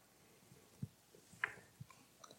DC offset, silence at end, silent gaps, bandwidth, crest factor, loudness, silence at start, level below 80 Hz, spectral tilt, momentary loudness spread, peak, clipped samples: under 0.1%; 0 s; none; 16.5 kHz; 30 dB; -49 LUFS; 0 s; -80 dBFS; -4 dB/octave; 21 LU; -22 dBFS; under 0.1%